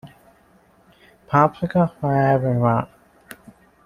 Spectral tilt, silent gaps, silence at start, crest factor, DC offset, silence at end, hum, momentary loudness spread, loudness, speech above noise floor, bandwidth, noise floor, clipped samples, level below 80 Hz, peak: -9 dB/octave; none; 0.05 s; 20 dB; under 0.1%; 1 s; none; 4 LU; -20 LUFS; 37 dB; 14.5 kHz; -55 dBFS; under 0.1%; -54 dBFS; -2 dBFS